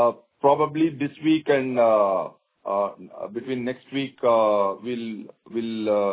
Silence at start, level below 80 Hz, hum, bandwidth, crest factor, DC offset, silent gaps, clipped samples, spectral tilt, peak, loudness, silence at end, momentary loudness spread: 0 s; -68 dBFS; none; 4 kHz; 16 dB; under 0.1%; none; under 0.1%; -10 dB/octave; -6 dBFS; -23 LUFS; 0 s; 14 LU